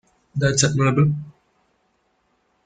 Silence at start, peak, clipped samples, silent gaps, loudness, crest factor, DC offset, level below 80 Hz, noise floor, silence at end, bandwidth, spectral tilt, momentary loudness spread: 0.35 s; -4 dBFS; under 0.1%; none; -20 LUFS; 20 dB; under 0.1%; -50 dBFS; -67 dBFS; 1.35 s; 9.4 kHz; -5 dB/octave; 14 LU